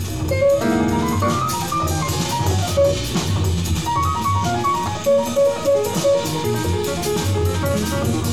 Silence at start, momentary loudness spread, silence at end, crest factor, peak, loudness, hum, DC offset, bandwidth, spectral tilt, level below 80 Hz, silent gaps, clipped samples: 0 s; 4 LU; 0 s; 12 dB; -6 dBFS; -19 LUFS; none; 0.9%; 17.5 kHz; -5 dB/octave; -36 dBFS; none; under 0.1%